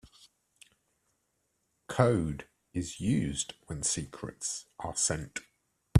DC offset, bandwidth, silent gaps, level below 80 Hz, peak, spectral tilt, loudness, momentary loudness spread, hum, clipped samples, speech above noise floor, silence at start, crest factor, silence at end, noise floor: under 0.1%; 14 kHz; none; -56 dBFS; -8 dBFS; -4.5 dB/octave; -32 LUFS; 13 LU; none; under 0.1%; 46 dB; 0.05 s; 26 dB; 0 s; -78 dBFS